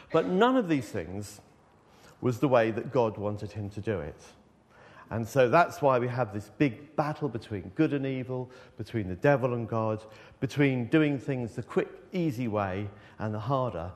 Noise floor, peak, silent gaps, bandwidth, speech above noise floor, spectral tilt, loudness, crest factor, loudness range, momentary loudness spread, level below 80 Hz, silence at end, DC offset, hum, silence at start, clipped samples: -59 dBFS; -8 dBFS; none; 13.5 kHz; 30 dB; -7.5 dB/octave; -29 LUFS; 20 dB; 3 LU; 13 LU; -62 dBFS; 0 s; under 0.1%; none; 0 s; under 0.1%